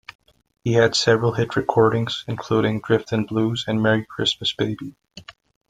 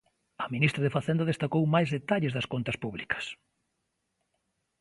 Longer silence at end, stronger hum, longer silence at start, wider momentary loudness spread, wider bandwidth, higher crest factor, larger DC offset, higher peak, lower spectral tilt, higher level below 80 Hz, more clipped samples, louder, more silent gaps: second, 0.4 s vs 1.45 s; neither; first, 0.65 s vs 0.4 s; about the same, 9 LU vs 9 LU; second, 9.4 kHz vs 11.5 kHz; about the same, 20 dB vs 22 dB; neither; first, -2 dBFS vs -8 dBFS; second, -5.5 dB/octave vs -7 dB/octave; first, -56 dBFS vs -62 dBFS; neither; first, -21 LUFS vs -29 LUFS; neither